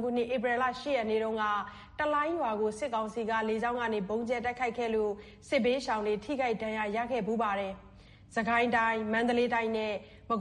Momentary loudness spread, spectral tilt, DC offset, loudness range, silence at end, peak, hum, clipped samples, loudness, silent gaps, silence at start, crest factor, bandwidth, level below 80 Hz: 7 LU; -5 dB/octave; under 0.1%; 2 LU; 0 s; -16 dBFS; none; under 0.1%; -31 LUFS; none; 0 s; 16 dB; 11.5 kHz; -60 dBFS